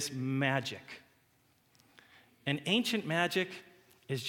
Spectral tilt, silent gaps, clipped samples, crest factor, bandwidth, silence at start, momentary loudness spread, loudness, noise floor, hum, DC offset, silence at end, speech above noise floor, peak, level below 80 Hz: -4.5 dB/octave; none; under 0.1%; 22 dB; 18 kHz; 0 s; 18 LU; -33 LUFS; -70 dBFS; none; under 0.1%; 0 s; 37 dB; -14 dBFS; -80 dBFS